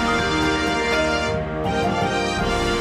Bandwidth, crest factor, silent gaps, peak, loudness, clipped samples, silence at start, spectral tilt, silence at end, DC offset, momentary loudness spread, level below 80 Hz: 15.5 kHz; 12 dB; none; -8 dBFS; -21 LUFS; under 0.1%; 0 s; -4.5 dB/octave; 0 s; under 0.1%; 3 LU; -34 dBFS